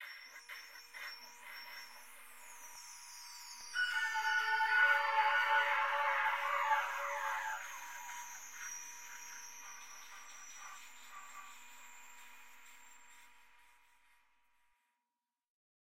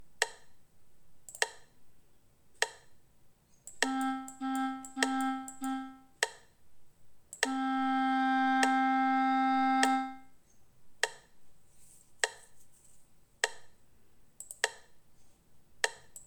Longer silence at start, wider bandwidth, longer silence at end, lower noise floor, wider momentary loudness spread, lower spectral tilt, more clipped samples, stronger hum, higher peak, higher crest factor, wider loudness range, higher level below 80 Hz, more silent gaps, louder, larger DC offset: about the same, 0 s vs 0 s; second, 16 kHz vs 19 kHz; first, 0.45 s vs 0.05 s; first, under -90 dBFS vs -65 dBFS; first, 23 LU vs 12 LU; second, 2.5 dB/octave vs -1 dB/octave; neither; neither; second, -18 dBFS vs -10 dBFS; about the same, 22 dB vs 26 dB; first, 21 LU vs 12 LU; second, -86 dBFS vs -72 dBFS; neither; second, -35 LUFS vs -32 LUFS; first, 0.1% vs under 0.1%